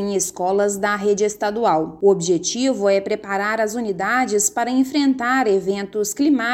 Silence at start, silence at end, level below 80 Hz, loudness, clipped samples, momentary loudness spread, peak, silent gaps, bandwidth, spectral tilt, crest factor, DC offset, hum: 0 s; 0 s; -58 dBFS; -19 LUFS; under 0.1%; 4 LU; -4 dBFS; none; 16.5 kHz; -3.5 dB/octave; 16 dB; under 0.1%; none